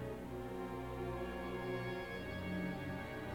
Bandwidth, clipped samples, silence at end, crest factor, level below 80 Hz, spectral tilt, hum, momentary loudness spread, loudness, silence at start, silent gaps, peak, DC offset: 17.5 kHz; under 0.1%; 0 s; 14 dB; -56 dBFS; -7 dB/octave; 60 Hz at -60 dBFS; 3 LU; -43 LUFS; 0 s; none; -30 dBFS; under 0.1%